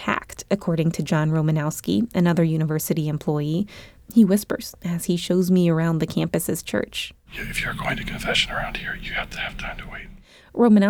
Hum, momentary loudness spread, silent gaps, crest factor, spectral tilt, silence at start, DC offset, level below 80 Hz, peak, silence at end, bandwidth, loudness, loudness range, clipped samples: none; 12 LU; none; 18 dB; -5.5 dB/octave; 0 s; under 0.1%; -44 dBFS; -6 dBFS; 0 s; 19 kHz; -23 LUFS; 4 LU; under 0.1%